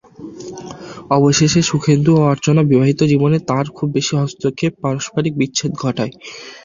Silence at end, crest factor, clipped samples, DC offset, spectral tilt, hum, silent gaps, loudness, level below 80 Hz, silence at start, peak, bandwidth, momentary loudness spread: 0.05 s; 14 dB; under 0.1%; under 0.1%; -5.5 dB/octave; none; none; -16 LUFS; -48 dBFS; 0.2 s; -2 dBFS; 7.6 kHz; 19 LU